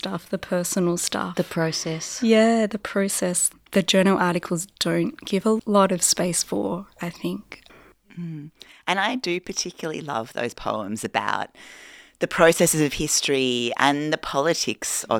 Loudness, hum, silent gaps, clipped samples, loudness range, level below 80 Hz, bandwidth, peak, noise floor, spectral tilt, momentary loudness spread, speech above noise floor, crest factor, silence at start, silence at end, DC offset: -23 LUFS; none; none; under 0.1%; 7 LU; -54 dBFS; 18 kHz; -2 dBFS; -51 dBFS; -3.5 dB/octave; 13 LU; 28 dB; 22 dB; 0.05 s; 0 s; under 0.1%